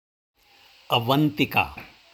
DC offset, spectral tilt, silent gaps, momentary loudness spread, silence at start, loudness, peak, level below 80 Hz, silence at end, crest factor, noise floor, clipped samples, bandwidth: under 0.1%; -6 dB/octave; none; 9 LU; 0.9 s; -23 LUFS; -6 dBFS; -54 dBFS; 0.3 s; 20 dB; -56 dBFS; under 0.1%; over 20 kHz